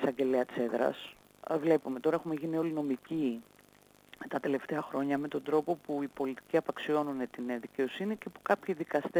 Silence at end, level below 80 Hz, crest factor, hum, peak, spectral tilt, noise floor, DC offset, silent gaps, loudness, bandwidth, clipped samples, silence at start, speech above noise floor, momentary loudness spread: 0 s; -76 dBFS; 18 dB; 50 Hz at -70 dBFS; -14 dBFS; -6.5 dB/octave; -62 dBFS; under 0.1%; none; -33 LUFS; over 20 kHz; under 0.1%; 0 s; 29 dB; 8 LU